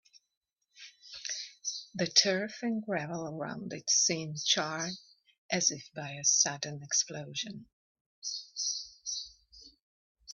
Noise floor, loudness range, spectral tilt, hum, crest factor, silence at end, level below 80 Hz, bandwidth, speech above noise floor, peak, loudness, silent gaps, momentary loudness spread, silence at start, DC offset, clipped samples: -58 dBFS; 6 LU; -1.5 dB/octave; none; 26 dB; 0 s; -76 dBFS; 7.6 kHz; 25 dB; -10 dBFS; -31 LUFS; 5.38-5.49 s, 7.73-7.95 s, 8.01-8.22 s, 9.82-10.15 s; 16 LU; 0.75 s; under 0.1%; under 0.1%